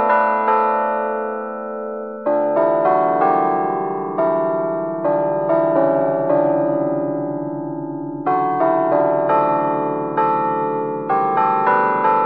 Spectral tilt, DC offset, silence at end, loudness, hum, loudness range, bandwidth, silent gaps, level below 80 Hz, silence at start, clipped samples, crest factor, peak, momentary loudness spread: -6.5 dB/octave; 0.2%; 0 s; -18 LUFS; none; 1 LU; 5 kHz; none; -72 dBFS; 0 s; under 0.1%; 16 dB; -2 dBFS; 9 LU